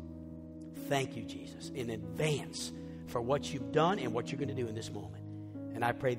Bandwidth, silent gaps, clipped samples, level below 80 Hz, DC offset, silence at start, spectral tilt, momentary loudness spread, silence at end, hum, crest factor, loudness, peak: 16 kHz; none; under 0.1%; -62 dBFS; under 0.1%; 0 s; -5.5 dB/octave; 15 LU; 0 s; none; 20 dB; -36 LUFS; -16 dBFS